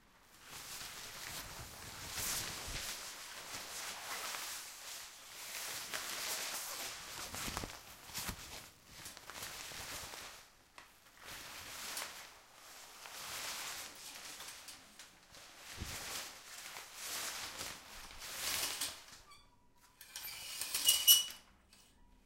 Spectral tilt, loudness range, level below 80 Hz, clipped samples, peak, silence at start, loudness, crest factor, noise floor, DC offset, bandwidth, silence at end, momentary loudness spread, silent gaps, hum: 0.5 dB/octave; 14 LU; -64 dBFS; under 0.1%; -10 dBFS; 0 s; -39 LUFS; 32 dB; -67 dBFS; under 0.1%; 16 kHz; 0.05 s; 16 LU; none; none